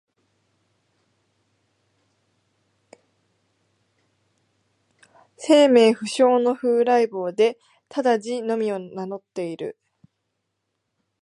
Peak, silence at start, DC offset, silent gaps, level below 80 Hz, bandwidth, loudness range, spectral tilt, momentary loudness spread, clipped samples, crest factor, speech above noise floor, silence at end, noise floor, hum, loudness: -4 dBFS; 5.4 s; under 0.1%; none; -82 dBFS; 11 kHz; 9 LU; -4.5 dB/octave; 17 LU; under 0.1%; 20 dB; 57 dB; 1.5 s; -77 dBFS; none; -21 LUFS